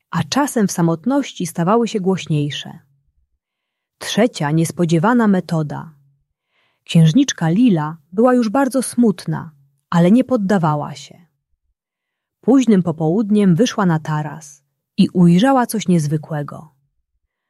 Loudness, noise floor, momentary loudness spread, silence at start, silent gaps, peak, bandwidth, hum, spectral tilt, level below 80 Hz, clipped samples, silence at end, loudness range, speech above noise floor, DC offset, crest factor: -16 LUFS; -81 dBFS; 13 LU; 0.15 s; none; -2 dBFS; 13 kHz; none; -6.5 dB/octave; -60 dBFS; under 0.1%; 0.9 s; 4 LU; 65 dB; under 0.1%; 14 dB